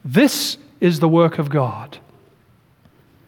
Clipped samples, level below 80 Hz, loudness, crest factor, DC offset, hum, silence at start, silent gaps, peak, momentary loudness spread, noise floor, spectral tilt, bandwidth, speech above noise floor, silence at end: under 0.1%; -64 dBFS; -18 LUFS; 18 dB; under 0.1%; none; 0.05 s; none; -2 dBFS; 12 LU; -55 dBFS; -5.5 dB/octave; 19 kHz; 38 dB; 1.3 s